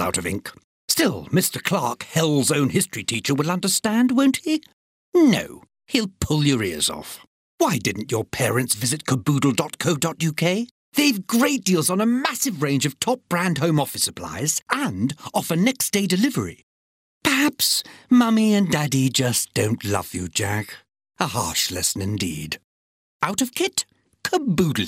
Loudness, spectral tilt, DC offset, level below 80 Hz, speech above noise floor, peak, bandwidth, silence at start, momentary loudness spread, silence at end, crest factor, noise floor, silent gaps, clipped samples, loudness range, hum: -21 LUFS; -4 dB/octave; under 0.1%; -54 dBFS; over 69 dB; -2 dBFS; 16 kHz; 0 s; 8 LU; 0 s; 20 dB; under -90 dBFS; 0.64-0.88 s, 4.73-5.12 s, 7.27-7.58 s, 10.71-10.92 s, 14.62-14.66 s, 16.63-17.21 s, 22.64-23.20 s; under 0.1%; 4 LU; none